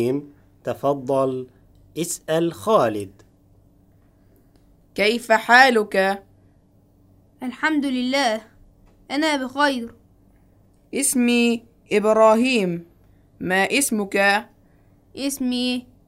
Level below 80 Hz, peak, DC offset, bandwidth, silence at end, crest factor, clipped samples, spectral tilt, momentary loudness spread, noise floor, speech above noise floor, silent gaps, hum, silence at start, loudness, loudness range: -58 dBFS; -2 dBFS; under 0.1%; 16 kHz; 0.25 s; 20 dB; under 0.1%; -3.5 dB/octave; 17 LU; -56 dBFS; 36 dB; none; none; 0 s; -20 LUFS; 5 LU